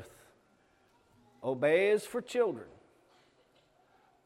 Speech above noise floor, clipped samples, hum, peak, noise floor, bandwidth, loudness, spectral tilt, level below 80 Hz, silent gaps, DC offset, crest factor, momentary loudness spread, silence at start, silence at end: 38 dB; under 0.1%; none; -16 dBFS; -68 dBFS; 15 kHz; -31 LUFS; -5 dB/octave; -78 dBFS; none; under 0.1%; 20 dB; 22 LU; 0 s; 1.6 s